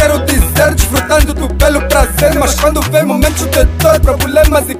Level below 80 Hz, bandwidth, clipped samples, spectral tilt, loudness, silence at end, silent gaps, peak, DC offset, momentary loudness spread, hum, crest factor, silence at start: -16 dBFS; 16.5 kHz; 0.4%; -4.5 dB/octave; -10 LUFS; 0 s; none; 0 dBFS; under 0.1%; 2 LU; none; 10 dB; 0 s